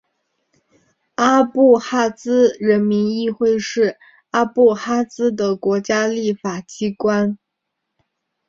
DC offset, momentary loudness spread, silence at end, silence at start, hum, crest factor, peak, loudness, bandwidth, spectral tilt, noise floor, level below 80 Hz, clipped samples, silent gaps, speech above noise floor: under 0.1%; 9 LU; 1.15 s; 1.2 s; none; 16 dB; -2 dBFS; -18 LUFS; 7.6 kHz; -5.5 dB/octave; -77 dBFS; -60 dBFS; under 0.1%; none; 61 dB